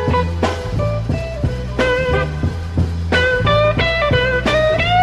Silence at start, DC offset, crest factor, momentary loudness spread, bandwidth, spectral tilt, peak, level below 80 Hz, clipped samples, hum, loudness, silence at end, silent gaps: 0 s; under 0.1%; 14 dB; 7 LU; 11.5 kHz; -6 dB/octave; -2 dBFS; -26 dBFS; under 0.1%; none; -17 LUFS; 0 s; none